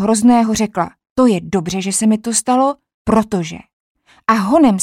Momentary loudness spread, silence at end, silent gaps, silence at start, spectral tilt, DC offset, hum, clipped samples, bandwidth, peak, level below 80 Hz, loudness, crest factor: 11 LU; 0 s; 1.10-1.16 s, 2.94-3.05 s, 3.73-3.95 s; 0 s; -5 dB/octave; under 0.1%; none; under 0.1%; 15.5 kHz; -2 dBFS; -46 dBFS; -15 LUFS; 14 dB